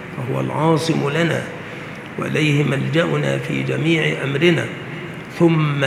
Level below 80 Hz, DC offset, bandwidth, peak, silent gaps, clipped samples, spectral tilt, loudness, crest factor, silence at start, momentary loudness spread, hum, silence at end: -56 dBFS; under 0.1%; 13.5 kHz; 0 dBFS; none; under 0.1%; -6.5 dB/octave; -19 LUFS; 18 dB; 0 s; 14 LU; none; 0 s